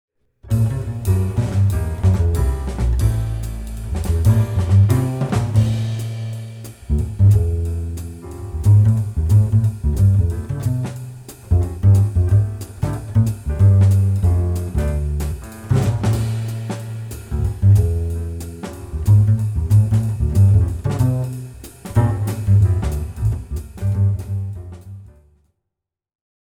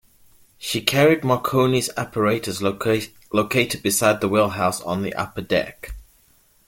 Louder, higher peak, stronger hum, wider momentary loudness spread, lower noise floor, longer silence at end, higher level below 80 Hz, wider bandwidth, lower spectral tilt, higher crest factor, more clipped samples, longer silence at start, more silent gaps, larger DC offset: first, -18 LUFS vs -21 LUFS; about the same, -4 dBFS vs -2 dBFS; neither; first, 15 LU vs 10 LU; first, -82 dBFS vs -58 dBFS; first, 1.35 s vs 0.65 s; first, -28 dBFS vs -48 dBFS; second, 14.5 kHz vs 17 kHz; first, -8 dB/octave vs -4.5 dB/octave; second, 14 dB vs 20 dB; neither; second, 0.45 s vs 0.6 s; neither; neither